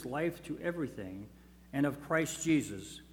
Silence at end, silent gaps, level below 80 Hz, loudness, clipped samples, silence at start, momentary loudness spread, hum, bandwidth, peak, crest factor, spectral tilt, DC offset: 0 s; none; -62 dBFS; -35 LUFS; under 0.1%; 0 s; 14 LU; none; 18.5 kHz; -18 dBFS; 18 dB; -5 dB/octave; under 0.1%